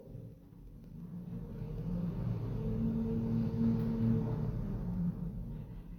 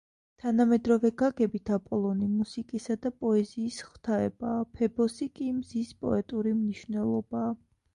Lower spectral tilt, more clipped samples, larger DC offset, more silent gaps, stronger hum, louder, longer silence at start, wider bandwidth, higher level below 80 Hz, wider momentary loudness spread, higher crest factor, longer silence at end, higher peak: first, -11 dB/octave vs -7 dB/octave; neither; neither; neither; neither; second, -36 LUFS vs -30 LUFS; second, 0 s vs 0.45 s; second, 6.2 kHz vs 10.5 kHz; first, -46 dBFS vs -60 dBFS; first, 18 LU vs 10 LU; about the same, 16 dB vs 16 dB; second, 0 s vs 0.4 s; second, -20 dBFS vs -12 dBFS